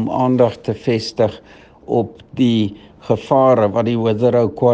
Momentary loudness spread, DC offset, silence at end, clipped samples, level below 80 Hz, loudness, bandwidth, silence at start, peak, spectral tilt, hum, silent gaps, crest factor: 8 LU; under 0.1%; 0 s; under 0.1%; -54 dBFS; -17 LUFS; 8.4 kHz; 0 s; 0 dBFS; -7.5 dB/octave; none; none; 16 dB